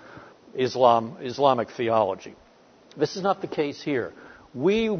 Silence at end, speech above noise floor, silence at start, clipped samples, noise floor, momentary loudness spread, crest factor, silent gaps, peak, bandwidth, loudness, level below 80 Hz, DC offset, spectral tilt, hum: 0 s; 30 dB; 0.05 s; under 0.1%; -54 dBFS; 16 LU; 20 dB; none; -4 dBFS; 6.6 kHz; -24 LUFS; -62 dBFS; under 0.1%; -6 dB/octave; none